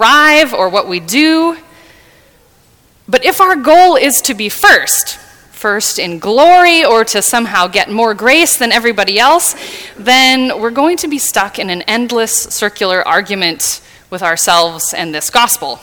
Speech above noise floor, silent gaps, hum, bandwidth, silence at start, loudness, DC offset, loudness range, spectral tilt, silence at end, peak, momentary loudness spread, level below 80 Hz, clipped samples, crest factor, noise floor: 37 dB; none; none; 20 kHz; 0 s; -10 LUFS; under 0.1%; 4 LU; -1.5 dB/octave; 0.05 s; 0 dBFS; 10 LU; -48 dBFS; 0.7%; 12 dB; -48 dBFS